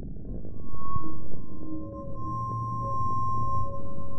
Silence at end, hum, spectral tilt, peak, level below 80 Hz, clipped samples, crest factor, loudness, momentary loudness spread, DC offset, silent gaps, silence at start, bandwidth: 0 s; none; -10 dB/octave; -10 dBFS; -44 dBFS; under 0.1%; 10 dB; -34 LUFS; 11 LU; under 0.1%; none; 0 s; 8.2 kHz